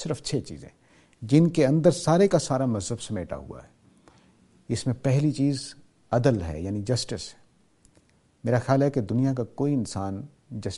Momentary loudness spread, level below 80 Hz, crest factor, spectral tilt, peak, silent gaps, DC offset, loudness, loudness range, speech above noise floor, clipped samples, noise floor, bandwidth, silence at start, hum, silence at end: 18 LU; -52 dBFS; 20 dB; -6.5 dB/octave; -6 dBFS; none; under 0.1%; -25 LUFS; 5 LU; 37 dB; under 0.1%; -62 dBFS; 11.5 kHz; 0 s; none; 0 s